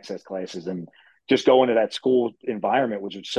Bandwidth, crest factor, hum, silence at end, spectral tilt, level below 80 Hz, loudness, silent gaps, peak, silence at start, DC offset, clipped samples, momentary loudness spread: 10 kHz; 18 dB; none; 0 s; -5 dB/octave; -68 dBFS; -22 LUFS; none; -4 dBFS; 0.05 s; under 0.1%; under 0.1%; 15 LU